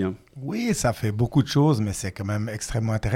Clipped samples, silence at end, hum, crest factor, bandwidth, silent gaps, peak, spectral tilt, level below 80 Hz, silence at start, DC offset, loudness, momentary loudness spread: under 0.1%; 0 s; none; 16 dB; 16.5 kHz; none; -8 dBFS; -6 dB/octave; -44 dBFS; 0 s; under 0.1%; -25 LUFS; 9 LU